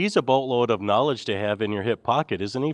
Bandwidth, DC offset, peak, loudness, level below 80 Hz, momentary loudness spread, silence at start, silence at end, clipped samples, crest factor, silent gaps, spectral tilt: 10.5 kHz; under 0.1%; -6 dBFS; -24 LUFS; -64 dBFS; 5 LU; 0 s; 0 s; under 0.1%; 18 dB; none; -6 dB/octave